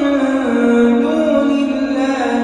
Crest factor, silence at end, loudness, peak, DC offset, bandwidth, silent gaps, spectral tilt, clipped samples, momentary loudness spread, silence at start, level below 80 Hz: 10 dB; 0 s; -15 LUFS; -4 dBFS; under 0.1%; 10 kHz; none; -5.5 dB/octave; under 0.1%; 4 LU; 0 s; -48 dBFS